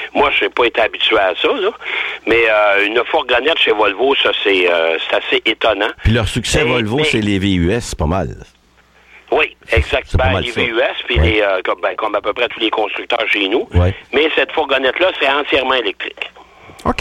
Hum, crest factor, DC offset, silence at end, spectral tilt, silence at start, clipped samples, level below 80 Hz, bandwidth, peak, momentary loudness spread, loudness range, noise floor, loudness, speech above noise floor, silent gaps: none; 12 dB; under 0.1%; 0.05 s; -5 dB/octave; 0 s; under 0.1%; -30 dBFS; 14 kHz; -2 dBFS; 6 LU; 4 LU; -50 dBFS; -15 LUFS; 35 dB; none